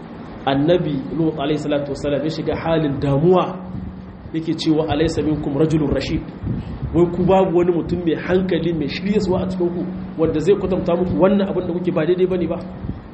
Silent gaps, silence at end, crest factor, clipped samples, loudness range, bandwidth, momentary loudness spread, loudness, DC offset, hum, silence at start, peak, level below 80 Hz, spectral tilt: none; 0 s; 18 dB; under 0.1%; 2 LU; 8.4 kHz; 11 LU; -19 LUFS; under 0.1%; none; 0 s; -2 dBFS; -38 dBFS; -7.5 dB/octave